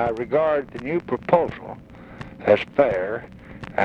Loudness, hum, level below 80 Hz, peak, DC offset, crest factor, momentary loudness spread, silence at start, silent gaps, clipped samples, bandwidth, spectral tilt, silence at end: -22 LUFS; none; -50 dBFS; -4 dBFS; under 0.1%; 20 dB; 20 LU; 0 s; none; under 0.1%; 6.8 kHz; -7.5 dB/octave; 0 s